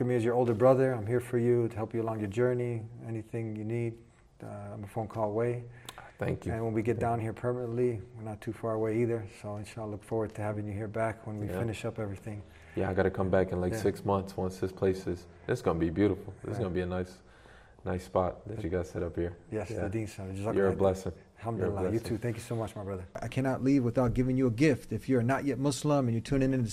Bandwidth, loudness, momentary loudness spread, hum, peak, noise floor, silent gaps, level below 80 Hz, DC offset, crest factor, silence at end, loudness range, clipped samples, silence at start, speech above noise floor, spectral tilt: 14.5 kHz; -32 LUFS; 12 LU; none; -10 dBFS; -55 dBFS; none; -54 dBFS; under 0.1%; 20 dB; 0 s; 6 LU; under 0.1%; 0 s; 24 dB; -7.5 dB/octave